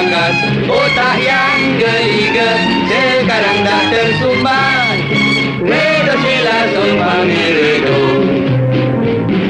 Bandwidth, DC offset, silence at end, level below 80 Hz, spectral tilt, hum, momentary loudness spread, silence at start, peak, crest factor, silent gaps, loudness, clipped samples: 10.5 kHz; under 0.1%; 0 s; -42 dBFS; -5.5 dB/octave; none; 2 LU; 0 s; -2 dBFS; 10 dB; none; -11 LUFS; under 0.1%